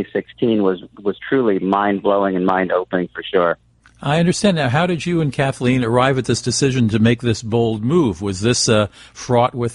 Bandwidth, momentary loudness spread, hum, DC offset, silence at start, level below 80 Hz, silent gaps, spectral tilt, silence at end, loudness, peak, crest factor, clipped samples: 11.5 kHz; 7 LU; none; under 0.1%; 0 s; -48 dBFS; none; -5.5 dB/octave; 0 s; -18 LUFS; -2 dBFS; 16 dB; under 0.1%